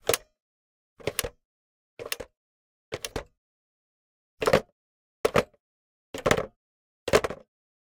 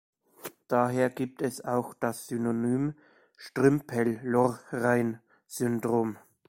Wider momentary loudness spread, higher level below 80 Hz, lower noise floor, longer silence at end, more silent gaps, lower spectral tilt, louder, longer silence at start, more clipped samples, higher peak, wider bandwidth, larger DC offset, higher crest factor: about the same, 16 LU vs 14 LU; first, -52 dBFS vs -66 dBFS; first, under -90 dBFS vs -47 dBFS; first, 0.65 s vs 0.3 s; first, 0.40-0.97 s, 1.45-1.97 s, 2.37-2.92 s, 3.38-4.37 s, 4.72-5.24 s, 5.60-6.14 s, 6.56-7.06 s vs none; second, -3.5 dB/octave vs -6.5 dB/octave; about the same, -29 LUFS vs -29 LUFS; second, 0.05 s vs 0.45 s; neither; first, -6 dBFS vs -10 dBFS; about the same, 17.5 kHz vs 16.5 kHz; neither; first, 26 dB vs 20 dB